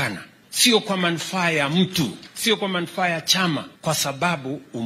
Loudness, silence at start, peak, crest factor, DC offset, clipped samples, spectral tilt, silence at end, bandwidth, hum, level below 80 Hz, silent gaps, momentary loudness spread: -21 LUFS; 0 s; -2 dBFS; 20 dB; under 0.1%; under 0.1%; -3 dB/octave; 0 s; 16 kHz; none; -62 dBFS; none; 11 LU